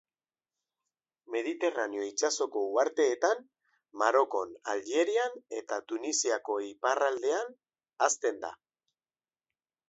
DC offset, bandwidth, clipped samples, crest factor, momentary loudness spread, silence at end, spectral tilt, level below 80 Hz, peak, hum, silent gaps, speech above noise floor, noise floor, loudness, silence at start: under 0.1%; 8.2 kHz; under 0.1%; 20 dB; 9 LU; 1.35 s; 0 dB/octave; -84 dBFS; -12 dBFS; none; none; over 60 dB; under -90 dBFS; -31 LUFS; 1.3 s